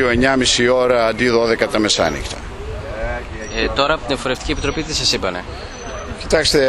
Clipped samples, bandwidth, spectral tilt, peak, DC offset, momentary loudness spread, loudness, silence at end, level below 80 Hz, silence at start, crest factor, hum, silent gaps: under 0.1%; 12.5 kHz; -3.5 dB/octave; 0 dBFS; under 0.1%; 15 LU; -17 LUFS; 0 s; -32 dBFS; 0 s; 18 dB; none; none